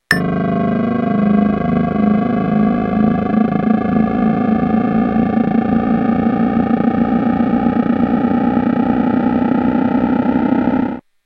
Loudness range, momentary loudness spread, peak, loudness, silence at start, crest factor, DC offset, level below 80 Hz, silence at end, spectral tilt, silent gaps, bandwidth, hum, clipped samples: 0 LU; 1 LU; 0 dBFS; -15 LUFS; 0.1 s; 14 dB; under 0.1%; -40 dBFS; 0.25 s; -8.5 dB/octave; none; 9.4 kHz; none; under 0.1%